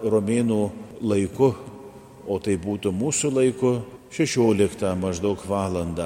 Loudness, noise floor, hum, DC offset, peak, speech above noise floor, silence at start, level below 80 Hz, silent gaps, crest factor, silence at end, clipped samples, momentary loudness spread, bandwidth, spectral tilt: -23 LUFS; -43 dBFS; none; under 0.1%; -6 dBFS; 20 dB; 0 s; -52 dBFS; none; 18 dB; 0 s; under 0.1%; 12 LU; 16 kHz; -5.5 dB/octave